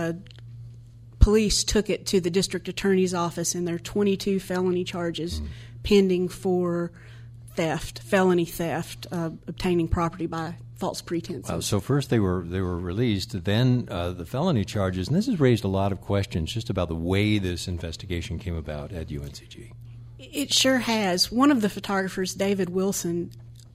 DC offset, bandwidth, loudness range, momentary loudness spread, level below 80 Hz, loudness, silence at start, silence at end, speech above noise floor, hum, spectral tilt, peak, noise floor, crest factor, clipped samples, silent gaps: under 0.1%; 15.5 kHz; 5 LU; 14 LU; -38 dBFS; -25 LUFS; 0 s; 0.05 s; 20 dB; none; -5 dB/octave; -2 dBFS; -45 dBFS; 22 dB; under 0.1%; none